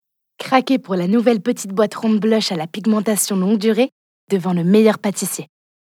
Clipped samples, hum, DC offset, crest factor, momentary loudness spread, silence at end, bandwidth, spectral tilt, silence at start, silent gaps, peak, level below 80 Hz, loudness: under 0.1%; none; under 0.1%; 18 dB; 7 LU; 0.55 s; 16.5 kHz; -5 dB/octave; 0.4 s; 3.92-4.28 s; 0 dBFS; -84 dBFS; -18 LUFS